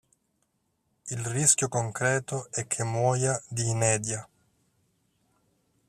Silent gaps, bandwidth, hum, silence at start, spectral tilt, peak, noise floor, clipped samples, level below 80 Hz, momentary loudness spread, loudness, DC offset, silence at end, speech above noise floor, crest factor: none; 14.5 kHz; none; 1.05 s; -4 dB/octave; -6 dBFS; -75 dBFS; under 0.1%; -64 dBFS; 12 LU; -27 LUFS; under 0.1%; 1.65 s; 48 dB; 24 dB